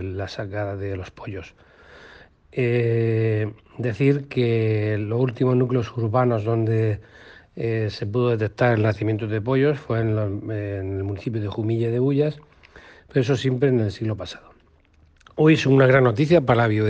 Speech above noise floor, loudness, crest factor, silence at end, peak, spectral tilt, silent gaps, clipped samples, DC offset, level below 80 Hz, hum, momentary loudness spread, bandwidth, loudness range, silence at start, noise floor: 35 dB; -22 LUFS; 18 dB; 0 s; -4 dBFS; -8 dB/octave; none; under 0.1%; under 0.1%; -54 dBFS; none; 13 LU; 7.6 kHz; 5 LU; 0 s; -56 dBFS